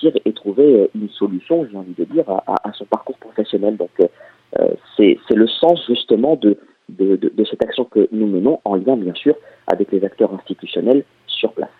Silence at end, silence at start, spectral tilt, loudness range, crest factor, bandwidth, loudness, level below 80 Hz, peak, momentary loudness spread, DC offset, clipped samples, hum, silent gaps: 0.1 s; 0 s; -8.5 dB/octave; 4 LU; 16 dB; 4.5 kHz; -17 LUFS; -62 dBFS; 0 dBFS; 10 LU; under 0.1%; under 0.1%; none; none